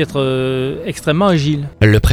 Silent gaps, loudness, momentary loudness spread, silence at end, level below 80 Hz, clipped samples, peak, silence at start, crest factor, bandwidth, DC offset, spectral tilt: none; -15 LUFS; 7 LU; 0 s; -26 dBFS; under 0.1%; 0 dBFS; 0 s; 14 dB; 19 kHz; under 0.1%; -6.5 dB/octave